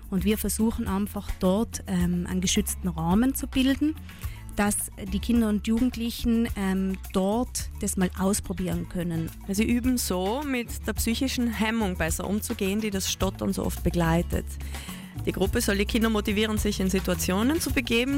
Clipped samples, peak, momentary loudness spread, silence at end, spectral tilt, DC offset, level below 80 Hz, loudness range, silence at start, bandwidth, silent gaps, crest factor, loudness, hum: under 0.1%; -12 dBFS; 7 LU; 0 s; -4.5 dB/octave; under 0.1%; -36 dBFS; 2 LU; 0 s; 16.5 kHz; none; 14 dB; -26 LUFS; none